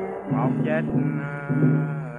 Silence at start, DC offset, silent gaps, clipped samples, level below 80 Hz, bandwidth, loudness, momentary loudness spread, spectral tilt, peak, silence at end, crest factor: 0 s; under 0.1%; none; under 0.1%; -56 dBFS; 3.7 kHz; -24 LUFS; 6 LU; -10.5 dB/octave; -8 dBFS; 0 s; 16 dB